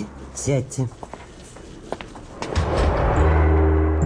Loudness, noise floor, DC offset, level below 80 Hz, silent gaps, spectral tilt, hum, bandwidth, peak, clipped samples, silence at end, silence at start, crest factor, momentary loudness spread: -21 LUFS; -40 dBFS; under 0.1%; -24 dBFS; none; -6.5 dB/octave; none; 10.5 kHz; -6 dBFS; under 0.1%; 0 s; 0 s; 16 dB; 22 LU